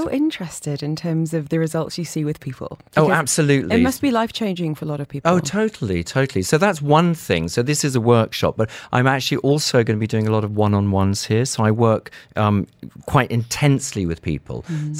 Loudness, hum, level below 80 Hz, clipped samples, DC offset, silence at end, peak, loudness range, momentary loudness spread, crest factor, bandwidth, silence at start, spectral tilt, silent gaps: -19 LUFS; none; -48 dBFS; under 0.1%; under 0.1%; 0 s; -2 dBFS; 2 LU; 10 LU; 16 dB; 16.5 kHz; 0 s; -5.5 dB/octave; none